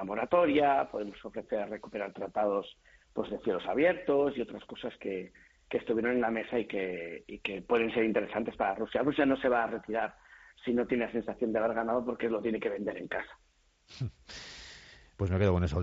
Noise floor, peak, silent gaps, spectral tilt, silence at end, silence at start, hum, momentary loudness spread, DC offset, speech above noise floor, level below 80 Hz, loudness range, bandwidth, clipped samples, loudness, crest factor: -54 dBFS; -14 dBFS; none; -5 dB/octave; 0 s; 0 s; none; 13 LU; under 0.1%; 23 dB; -58 dBFS; 4 LU; 7.6 kHz; under 0.1%; -32 LUFS; 18 dB